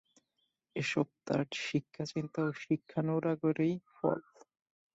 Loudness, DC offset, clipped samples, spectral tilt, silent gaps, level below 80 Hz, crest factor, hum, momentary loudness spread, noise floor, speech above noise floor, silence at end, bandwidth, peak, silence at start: -35 LUFS; under 0.1%; under 0.1%; -6.5 dB/octave; none; -74 dBFS; 20 dB; none; 6 LU; -82 dBFS; 48 dB; 0.75 s; 8 kHz; -16 dBFS; 0.75 s